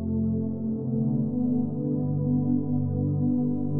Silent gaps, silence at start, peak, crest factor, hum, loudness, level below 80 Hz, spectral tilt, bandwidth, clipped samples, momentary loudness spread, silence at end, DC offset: none; 0 s; -14 dBFS; 12 dB; none; -27 LUFS; -52 dBFS; -17 dB/octave; 1.4 kHz; under 0.1%; 3 LU; 0 s; under 0.1%